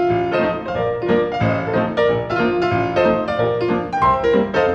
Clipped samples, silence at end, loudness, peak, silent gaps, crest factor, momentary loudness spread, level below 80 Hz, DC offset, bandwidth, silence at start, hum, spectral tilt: under 0.1%; 0 s; -18 LUFS; -4 dBFS; none; 14 dB; 4 LU; -42 dBFS; under 0.1%; 7.6 kHz; 0 s; none; -7.5 dB/octave